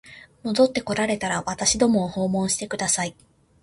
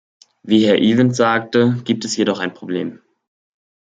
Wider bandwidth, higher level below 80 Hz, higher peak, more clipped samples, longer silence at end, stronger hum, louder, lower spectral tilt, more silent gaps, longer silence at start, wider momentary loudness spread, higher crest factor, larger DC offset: first, 11.5 kHz vs 9.2 kHz; first, -52 dBFS vs -60 dBFS; second, -6 dBFS vs 0 dBFS; neither; second, 0.5 s vs 0.9 s; neither; second, -23 LUFS vs -17 LUFS; second, -3.5 dB/octave vs -5.5 dB/octave; neither; second, 0.05 s vs 0.45 s; second, 6 LU vs 11 LU; about the same, 18 dB vs 18 dB; neither